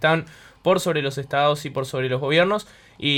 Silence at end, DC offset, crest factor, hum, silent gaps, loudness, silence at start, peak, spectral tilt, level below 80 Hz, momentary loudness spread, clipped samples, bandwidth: 0 s; under 0.1%; 16 dB; none; none; -22 LUFS; 0 s; -6 dBFS; -5 dB/octave; -58 dBFS; 8 LU; under 0.1%; 17.5 kHz